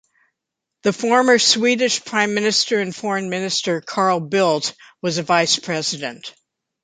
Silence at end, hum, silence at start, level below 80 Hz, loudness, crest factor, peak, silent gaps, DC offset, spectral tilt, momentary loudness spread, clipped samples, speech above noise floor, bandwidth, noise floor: 0.55 s; none; 0.85 s; -68 dBFS; -18 LUFS; 18 dB; -2 dBFS; none; under 0.1%; -3 dB/octave; 11 LU; under 0.1%; 63 dB; 9.6 kHz; -82 dBFS